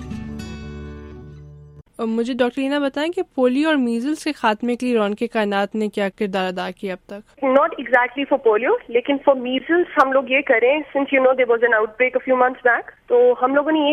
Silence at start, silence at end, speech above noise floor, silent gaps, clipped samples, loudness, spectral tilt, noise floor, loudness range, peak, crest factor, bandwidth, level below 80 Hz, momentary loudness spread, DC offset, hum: 0 s; 0 s; 25 dB; none; under 0.1%; -19 LUFS; -5.5 dB/octave; -43 dBFS; 5 LU; -2 dBFS; 18 dB; 12 kHz; -48 dBFS; 15 LU; under 0.1%; none